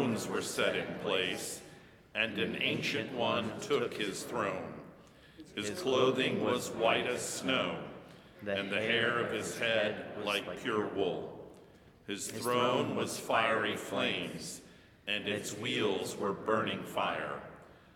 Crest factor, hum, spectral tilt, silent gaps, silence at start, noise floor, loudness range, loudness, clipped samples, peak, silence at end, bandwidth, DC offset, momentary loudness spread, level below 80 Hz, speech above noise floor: 20 dB; none; -3.5 dB/octave; none; 0 s; -58 dBFS; 2 LU; -33 LUFS; under 0.1%; -14 dBFS; 0.2 s; 18.5 kHz; under 0.1%; 14 LU; -70 dBFS; 25 dB